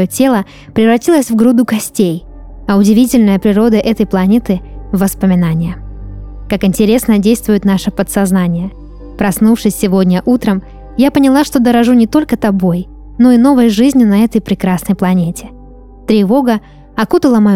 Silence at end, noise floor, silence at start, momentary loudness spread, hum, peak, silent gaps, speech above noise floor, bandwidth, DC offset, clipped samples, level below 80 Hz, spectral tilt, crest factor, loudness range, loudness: 0 s; -34 dBFS; 0 s; 11 LU; none; 0 dBFS; none; 24 dB; 16.5 kHz; 0.3%; under 0.1%; -34 dBFS; -6.5 dB/octave; 10 dB; 3 LU; -11 LUFS